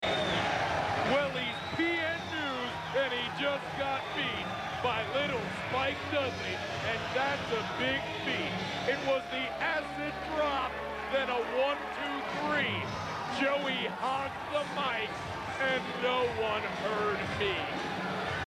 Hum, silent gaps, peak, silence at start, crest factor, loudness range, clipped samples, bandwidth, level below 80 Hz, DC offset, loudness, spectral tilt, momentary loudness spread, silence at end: none; none; -16 dBFS; 0 s; 16 dB; 1 LU; under 0.1%; 14.5 kHz; -58 dBFS; under 0.1%; -32 LUFS; -4.5 dB/octave; 5 LU; 0.05 s